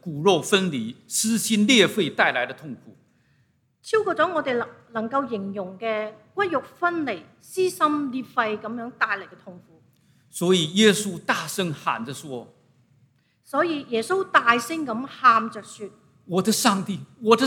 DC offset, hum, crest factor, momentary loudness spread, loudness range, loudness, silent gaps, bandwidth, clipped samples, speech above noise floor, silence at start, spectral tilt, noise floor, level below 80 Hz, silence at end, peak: under 0.1%; none; 24 dB; 16 LU; 5 LU; -23 LUFS; none; 18 kHz; under 0.1%; 42 dB; 0.05 s; -3.5 dB/octave; -65 dBFS; -74 dBFS; 0 s; 0 dBFS